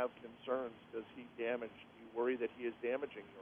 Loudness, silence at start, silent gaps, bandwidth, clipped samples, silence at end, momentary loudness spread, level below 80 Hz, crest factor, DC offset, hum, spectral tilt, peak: -42 LUFS; 0 s; none; 3.7 kHz; under 0.1%; 0 s; 12 LU; -80 dBFS; 16 dB; under 0.1%; none; -7 dB/octave; -26 dBFS